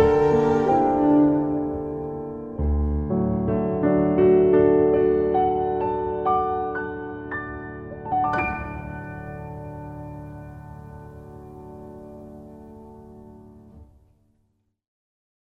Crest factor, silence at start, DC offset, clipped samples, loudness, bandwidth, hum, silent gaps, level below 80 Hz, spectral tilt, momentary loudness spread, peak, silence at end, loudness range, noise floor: 16 dB; 0 s; under 0.1%; under 0.1%; -22 LUFS; 7 kHz; none; none; -40 dBFS; -9.5 dB/octave; 24 LU; -8 dBFS; 1.7 s; 22 LU; -70 dBFS